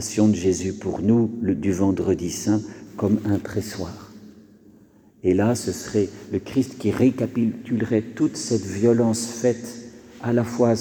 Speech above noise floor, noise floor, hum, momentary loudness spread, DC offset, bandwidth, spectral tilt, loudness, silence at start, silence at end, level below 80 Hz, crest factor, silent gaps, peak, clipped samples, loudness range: 31 dB; -52 dBFS; none; 11 LU; under 0.1%; 19.5 kHz; -6 dB/octave; -23 LUFS; 0 s; 0 s; -54 dBFS; 16 dB; none; -6 dBFS; under 0.1%; 4 LU